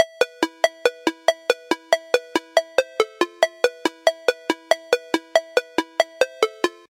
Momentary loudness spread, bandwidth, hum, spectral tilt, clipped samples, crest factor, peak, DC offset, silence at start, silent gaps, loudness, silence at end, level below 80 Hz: 3 LU; 17 kHz; none; -1.5 dB/octave; under 0.1%; 22 dB; 0 dBFS; under 0.1%; 0 s; none; -22 LUFS; 0.2 s; -72 dBFS